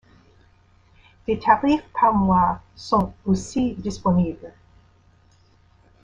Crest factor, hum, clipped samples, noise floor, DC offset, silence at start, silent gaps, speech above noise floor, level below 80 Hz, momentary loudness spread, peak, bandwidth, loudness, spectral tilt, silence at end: 20 dB; none; under 0.1%; -56 dBFS; under 0.1%; 1.3 s; none; 36 dB; -46 dBFS; 10 LU; -4 dBFS; 9.4 kHz; -21 LUFS; -7 dB/octave; 1.55 s